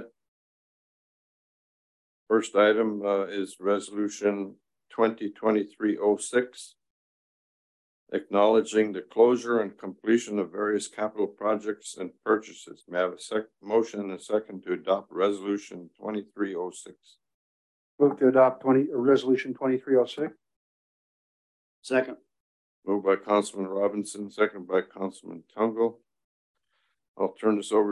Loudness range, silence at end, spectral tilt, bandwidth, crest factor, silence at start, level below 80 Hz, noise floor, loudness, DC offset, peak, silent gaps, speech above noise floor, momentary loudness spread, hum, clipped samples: 6 LU; 0 s; -5 dB/octave; 11.5 kHz; 20 dB; 0 s; -78 dBFS; -76 dBFS; -27 LUFS; under 0.1%; -8 dBFS; 0.28-2.26 s, 6.90-8.07 s, 17.34-17.98 s, 20.56-21.82 s, 22.40-22.82 s, 26.24-26.54 s, 27.08-27.14 s; 50 dB; 14 LU; none; under 0.1%